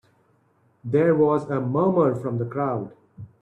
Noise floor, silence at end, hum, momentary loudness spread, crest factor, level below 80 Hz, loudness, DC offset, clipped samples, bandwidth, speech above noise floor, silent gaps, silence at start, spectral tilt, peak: -63 dBFS; 0.15 s; none; 11 LU; 16 dB; -64 dBFS; -22 LUFS; under 0.1%; under 0.1%; 9 kHz; 42 dB; none; 0.85 s; -10 dB/octave; -8 dBFS